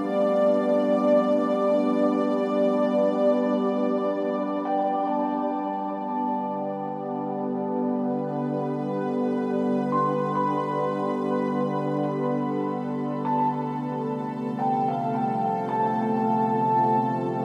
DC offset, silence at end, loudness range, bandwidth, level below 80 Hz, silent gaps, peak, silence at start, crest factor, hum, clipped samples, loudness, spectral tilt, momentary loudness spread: under 0.1%; 0 s; 5 LU; 8.4 kHz; -78 dBFS; none; -10 dBFS; 0 s; 14 dB; none; under 0.1%; -25 LUFS; -8.5 dB/octave; 7 LU